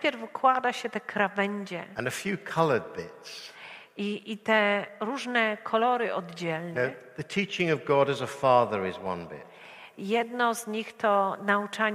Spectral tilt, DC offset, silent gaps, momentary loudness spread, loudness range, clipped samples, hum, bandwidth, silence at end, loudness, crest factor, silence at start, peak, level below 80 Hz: -5 dB/octave; under 0.1%; none; 17 LU; 3 LU; under 0.1%; none; 15.5 kHz; 0 s; -28 LUFS; 20 dB; 0 s; -8 dBFS; -72 dBFS